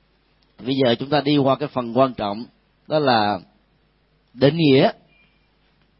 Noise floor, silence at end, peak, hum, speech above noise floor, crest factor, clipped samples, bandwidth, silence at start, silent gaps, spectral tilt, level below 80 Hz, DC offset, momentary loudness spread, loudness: -62 dBFS; 1.05 s; -2 dBFS; none; 43 dB; 20 dB; under 0.1%; 5.8 kHz; 0.6 s; none; -11 dB/octave; -58 dBFS; under 0.1%; 13 LU; -19 LUFS